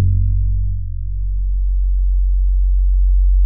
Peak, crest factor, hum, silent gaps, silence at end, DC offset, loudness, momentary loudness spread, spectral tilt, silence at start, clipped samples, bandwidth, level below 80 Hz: -6 dBFS; 8 dB; none; none; 0 s; 4%; -20 LUFS; 7 LU; -18 dB/octave; 0 s; under 0.1%; 0.4 kHz; -14 dBFS